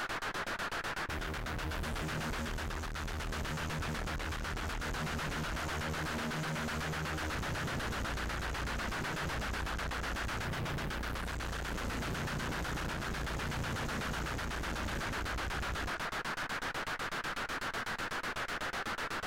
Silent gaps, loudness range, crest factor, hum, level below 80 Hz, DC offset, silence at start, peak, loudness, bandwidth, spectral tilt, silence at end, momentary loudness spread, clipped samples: none; 1 LU; 8 dB; none; -44 dBFS; under 0.1%; 0 s; -28 dBFS; -37 LUFS; 16.5 kHz; -4 dB/octave; 0 s; 2 LU; under 0.1%